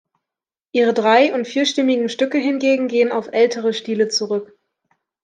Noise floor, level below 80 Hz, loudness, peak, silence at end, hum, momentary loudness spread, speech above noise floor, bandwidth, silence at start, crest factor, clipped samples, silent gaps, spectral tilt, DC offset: -88 dBFS; -74 dBFS; -18 LUFS; -2 dBFS; 0.8 s; none; 7 LU; 71 dB; 9.4 kHz; 0.75 s; 16 dB; under 0.1%; none; -3.5 dB/octave; under 0.1%